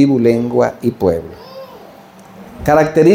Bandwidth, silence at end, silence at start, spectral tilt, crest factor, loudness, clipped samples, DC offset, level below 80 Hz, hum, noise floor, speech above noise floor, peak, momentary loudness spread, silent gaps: 16.5 kHz; 0 s; 0 s; -7.5 dB/octave; 14 dB; -14 LUFS; under 0.1%; under 0.1%; -42 dBFS; none; -39 dBFS; 27 dB; 0 dBFS; 22 LU; none